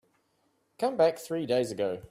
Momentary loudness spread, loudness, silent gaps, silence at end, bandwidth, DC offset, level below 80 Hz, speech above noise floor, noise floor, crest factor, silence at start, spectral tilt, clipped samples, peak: 7 LU; -29 LUFS; none; 0.05 s; 15.5 kHz; under 0.1%; -68 dBFS; 44 dB; -73 dBFS; 18 dB; 0.8 s; -5.5 dB/octave; under 0.1%; -12 dBFS